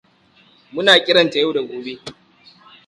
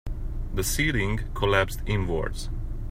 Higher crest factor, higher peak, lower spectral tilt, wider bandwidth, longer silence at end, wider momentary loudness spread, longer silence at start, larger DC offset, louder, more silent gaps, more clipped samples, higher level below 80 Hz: about the same, 20 dB vs 20 dB; first, 0 dBFS vs -6 dBFS; about the same, -3.5 dB/octave vs -4.5 dB/octave; second, 11.5 kHz vs 16 kHz; first, 0.75 s vs 0 s; first, 21 LU vs 12 LU; first, 0.75 s vs 0.05 s; neither; first, -15 LUFS vs -27 LUFS; neither; neither; second, -64 dBFS vs -30 dBFS